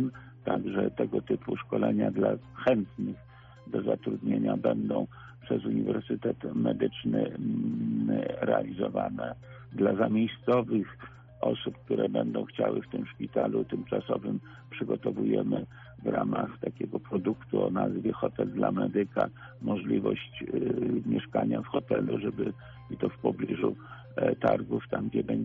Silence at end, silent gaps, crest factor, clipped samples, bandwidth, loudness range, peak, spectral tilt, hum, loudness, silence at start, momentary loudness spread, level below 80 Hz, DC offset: 0 s; none; 18 dB; under 0.1%; 4.3 kHz; 2 LU; -12 dBFS; -6.5 dB/octave; none; -31 LUFS; 0 s; 9 LU; -62 dBFS; under 0.1%